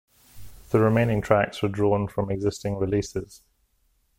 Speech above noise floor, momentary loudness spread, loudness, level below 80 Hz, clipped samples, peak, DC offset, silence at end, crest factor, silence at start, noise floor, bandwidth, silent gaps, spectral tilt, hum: 44 dB; 8 LU; -24 LUFS; -48 dBFS; under 0.1%; -4 dBFS; under 0.1%; 0.85 s; 20 dB; 0.35 s; -67 dBFS; 16.5 kHz; none; -7 dB/octave; none